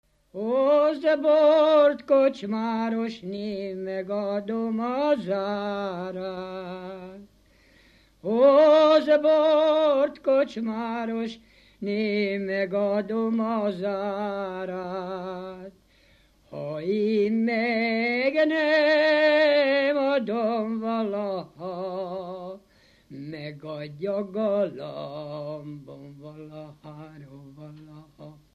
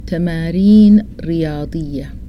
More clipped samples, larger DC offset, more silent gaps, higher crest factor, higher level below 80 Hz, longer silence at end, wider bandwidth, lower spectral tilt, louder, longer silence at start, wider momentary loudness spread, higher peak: neither; neither; neither; first, 18 dB vs 12 dB; second, -66 dBFS vs -32 dBFS; first, 0.25 s vs 0 s; first, 7 kHz vs 5.8 kHz; second, -6.5 dB/octave vs -9 dB/octave; second, -24 LUFS vs -13 LUFS; first, 0.35 s vs 0 s; first, 21 LU vs 15 LU; second, -8 dBFS vs 0 dBFS